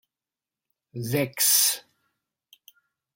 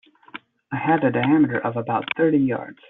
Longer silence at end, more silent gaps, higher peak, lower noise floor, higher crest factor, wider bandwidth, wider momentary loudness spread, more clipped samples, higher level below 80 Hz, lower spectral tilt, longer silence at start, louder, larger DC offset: first, 1.35 s vs 0.2 s; neither; about the same, -8 dBFS vs -6 dBFS; first, under -90 dBFS vs -43 dBFS; first, 22 dB vs 16 dB; first, 17 kHz vs 4 kHz; second, 18 LU vs 22 LU; neither; second, -70 dBFS vs -62 dBFS; second, -2 dB/octave vs -5.5 dB/octave; first, 0.95 s vs 0.35 s; about the same, -21 LUFS vs -21 LUFS; neither